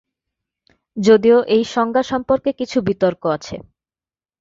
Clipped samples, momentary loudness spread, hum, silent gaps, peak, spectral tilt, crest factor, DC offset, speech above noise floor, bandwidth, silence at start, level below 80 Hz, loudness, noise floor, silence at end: under 0.1%; 14 LU; none; none; -2 dBFS; -6 dB/octave; 16 dB; under 0.1%; over 74 dB; 7.6 kHz; 0.95 s; -52 dBFS; -17 LUFS; under -90 dBFS; 0.8 s